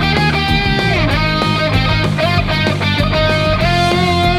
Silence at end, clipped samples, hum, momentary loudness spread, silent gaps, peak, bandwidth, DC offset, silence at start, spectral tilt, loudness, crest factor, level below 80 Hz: 0 s; under 0.1%; none; 2 LU; none; -2 dBFS; 15 kHz; under 0.1%; 0 s; -6 dB/octave; -14 LUFS; 12 dB; -24 dBFS